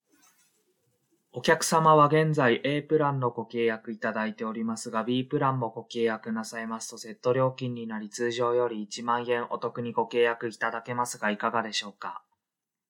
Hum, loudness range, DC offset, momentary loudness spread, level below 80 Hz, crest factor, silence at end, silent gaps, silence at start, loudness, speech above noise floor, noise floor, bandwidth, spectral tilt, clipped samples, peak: none; 6 LU; under 0.1%; 12 LU; -76 dBFS; 22 dB; 0.7 s; none; 1.35 s; -27 LUFS; 61 dB; -88 dBFS; 19 kHz; -5 dB/octave; under 0.1%; -6 dBFS